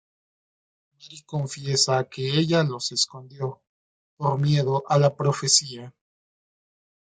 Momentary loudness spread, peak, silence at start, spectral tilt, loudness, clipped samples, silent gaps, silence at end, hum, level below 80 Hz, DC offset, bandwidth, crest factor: 13 LU; -4 dBFS; 1.05 s; -4 dB/octave; -23 LUFS; under 0.1%; 3.67-4.17 s; 1.25 s; none; -66 dBFS; under 0.1%; 9.4 kHz; 22 dB